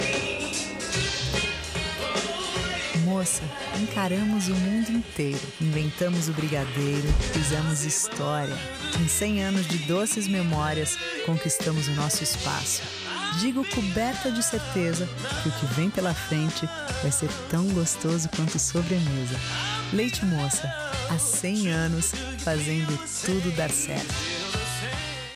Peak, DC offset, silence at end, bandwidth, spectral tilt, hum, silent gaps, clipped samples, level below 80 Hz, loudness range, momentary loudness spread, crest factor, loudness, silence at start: -12 dBFS; under 0.1%; 0 s; 15.5 kHz; -4 dB/octave; none; none; under 0.1%; -40 dBFS; 1 LU; 4 LU; 14 dB; -26 LUFS; 0 s